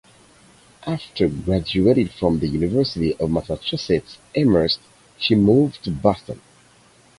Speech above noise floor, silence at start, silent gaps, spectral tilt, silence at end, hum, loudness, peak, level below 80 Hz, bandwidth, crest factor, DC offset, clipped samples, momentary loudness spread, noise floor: 33 dB; 0.85 s; none; -7 dB/octave; 0.85 s; none; -20 LUFS; -2 dBFS; -42 dBFS; 11.5 kHz; 20 dB; under 0.1%; under 0.1%; 11 LU; -53 dBFS